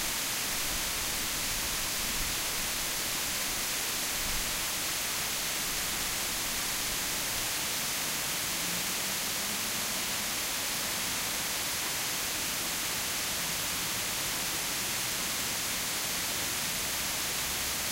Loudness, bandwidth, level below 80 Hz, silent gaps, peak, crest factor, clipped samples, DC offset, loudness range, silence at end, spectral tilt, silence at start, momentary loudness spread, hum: -30 LUFS; 16 kHz; -50 dBFS; none; -18 dBFS; 14 dB; under 0.1%; under 0.1%; 0 LU; 0 s; -0.5 dB/octave; 0 s; 0 LU; none